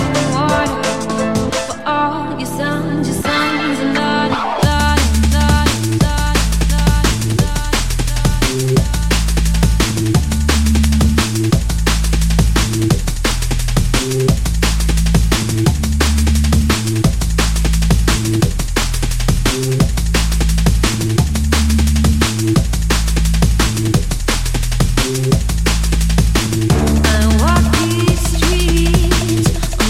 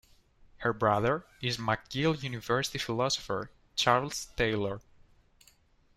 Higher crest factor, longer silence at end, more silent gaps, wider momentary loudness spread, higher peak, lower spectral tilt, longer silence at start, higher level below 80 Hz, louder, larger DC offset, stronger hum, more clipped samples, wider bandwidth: second, 14 dB vs 22 dB; second, 0 s vs 1.2 s; neither; second, 4 LU vs 10 LU; first, 0 dBFS vs -10 dBFS; about the same, -5 dB/octave vs -4 dB/octave; second, 0 s vs 0.6 s; first, -18 dBFS vs -54 dBFS; first, -15 LUFS vs -31 LUFS; first, 2% vs under 0.1%; neither; neither; about the same, 16.5 kHz vs 15.5 kHz